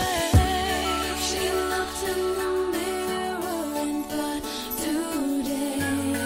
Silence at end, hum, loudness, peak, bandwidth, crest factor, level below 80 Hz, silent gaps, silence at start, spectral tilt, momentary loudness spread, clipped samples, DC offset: 0 s; none; -26 LUFS; -8 dBFS; 16 kHz; 18 dB; -36 dBFS; none; 0 s; -4.5 dB/octave; 7 LU; under 0.1%; under 0.1%